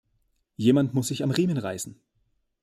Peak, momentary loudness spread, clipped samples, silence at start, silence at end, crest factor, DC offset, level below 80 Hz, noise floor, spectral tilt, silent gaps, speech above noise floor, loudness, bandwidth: -8 dBFS; 13 LU; under 0.1%; 0.6 s; 0.7 s; 18 dB; under 0.1%; -66 dBFS; -72 dBFS; -6 dB/octave; none; 47 dB; -25 LUFS; 15.5 kHz